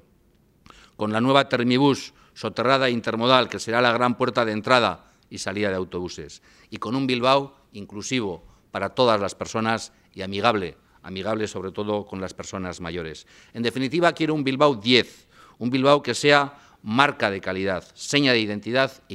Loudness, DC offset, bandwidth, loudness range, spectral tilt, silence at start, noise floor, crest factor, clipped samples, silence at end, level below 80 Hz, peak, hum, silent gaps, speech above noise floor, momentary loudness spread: -22 LUFS; under 0.1%; 13 kHz; 6 LU; -4.5 dB/octave; 1 s; -60 dBFS; 24 dB; under 0.1%; 0 s; -60 dBFS; 0 dBFS; none; none; 37 dB; 16 LU